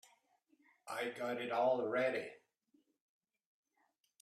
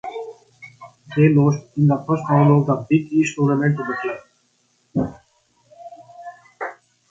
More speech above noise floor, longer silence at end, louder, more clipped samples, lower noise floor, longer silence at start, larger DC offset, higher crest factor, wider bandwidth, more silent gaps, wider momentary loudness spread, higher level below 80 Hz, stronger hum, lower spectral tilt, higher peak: second, 43 dB vs 47 dB; first, 1.85 s vs 0.4 s; second, -38 LUFS vs -19 LUFS; neither; first, -81 dBFS vs -64 dBFS; first, 0.85 s vs 0.05 s; neither; about the same, 18 dB vs 18 dB; first, 14 kHz vs 7.6 kHz; neither; second, 11 LU vs 24 LU; second, under -90 dBFS vs -56 dBFS; second, none vs 60 Hz at -50 dBFS; second, -4.5 dB/octave vs -8 dB/octave; second, -24 dBFS vs -2 dBFS